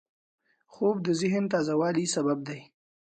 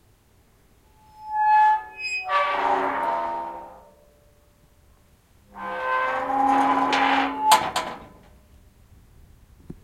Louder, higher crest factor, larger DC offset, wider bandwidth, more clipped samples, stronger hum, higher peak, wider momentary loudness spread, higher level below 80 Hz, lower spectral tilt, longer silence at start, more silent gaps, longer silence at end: second, -27 LUFS vs -22 LUFS; second, 16 dB vs 24 dB; neither; second, 9.6 kHz vs 16.5 kHz; neither; neither; second, -14 dBFS vs -2 dBFS; second, 7 LU vs 17 LU; second, -72 dBFS vs -58 dBFS; first, -5 dB/octave vs -2.5 dB/octave; second, 0.75 s vs 1.2 s; neither; first, 0.5 s vs 0.1 s